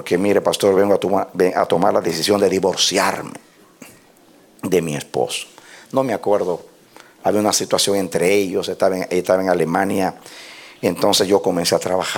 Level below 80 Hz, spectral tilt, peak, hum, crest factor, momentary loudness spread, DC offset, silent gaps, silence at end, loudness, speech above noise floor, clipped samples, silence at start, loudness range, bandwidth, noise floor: -60 dBFS; -3.5 dB/octave; -2 dBFS; none; 16 dB; 9 LU; under 0.1%; none; 0 s; -18 LUFS; 32 dB; under 0.1%; 0 s; 6 LU; 18 kHz; -50 dBFS